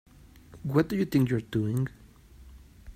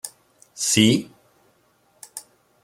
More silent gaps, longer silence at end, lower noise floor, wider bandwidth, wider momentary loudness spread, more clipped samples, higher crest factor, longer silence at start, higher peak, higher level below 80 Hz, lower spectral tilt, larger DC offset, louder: neither; second, 0.05 s vs 0.45 s; second, -52 dBFS vs -62 dBFS; about the same, 16 kHz vs 16.5 kHz; second, 8 LU vs 22 LU; neither; about the same, 20 dB vs 24 dB; first, 0.5 s vs 0.05 s; second, -10 dBFS vs -2 dBFS; first, -52 dBFS vs -62 dBFS; first, -8 dB/octave vs -3.5 dB/octave; neither; second, -28 LUFS vs -19 LUFS